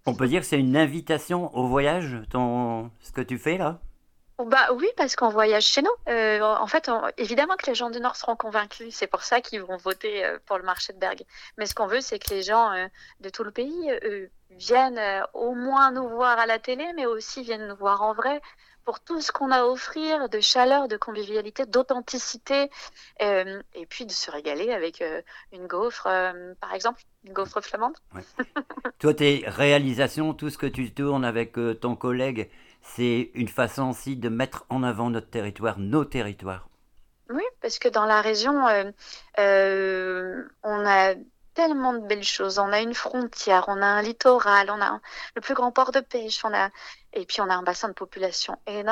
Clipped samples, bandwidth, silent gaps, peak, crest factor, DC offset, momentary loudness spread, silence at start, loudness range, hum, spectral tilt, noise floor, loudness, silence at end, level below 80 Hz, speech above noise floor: under 0.1%; 19 kHz; none; -2 dBFS; 22 dB; under 0.1%; 14 LU; 0.05 s; 6 LU; none; -4 dB/octave; -57 dBFS; -25 LUFS; 0 s; -54 dBFS; 32 dB